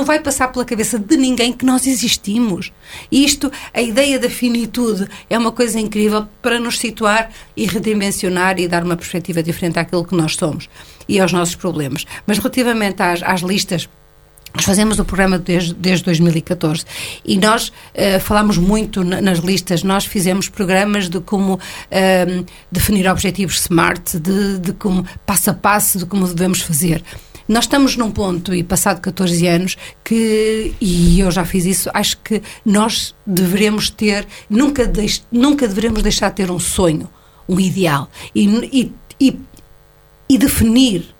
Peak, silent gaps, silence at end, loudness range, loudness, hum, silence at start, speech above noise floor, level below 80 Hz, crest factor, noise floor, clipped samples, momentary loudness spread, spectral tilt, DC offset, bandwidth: 0 dBFS; none; 0.15 s; 2 LU; -16 LUFS; none; 0 s; 31 dB; -32 dBFS; 16 dB; -47 dBFS; under 0.1%; 7 LU; -4.5 dB/octave; under 0.1%; 19 kHz